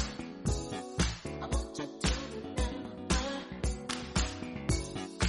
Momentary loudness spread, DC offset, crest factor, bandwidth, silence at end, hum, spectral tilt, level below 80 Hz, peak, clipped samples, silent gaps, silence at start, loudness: 6 LU; under 0.1%; 18 dB; 11.5 kHz; 0 s; none; -4.5 dB/octave; -40 dBFS; -16 dBFS; under 0.1%; none; 0 s; -35 LUFS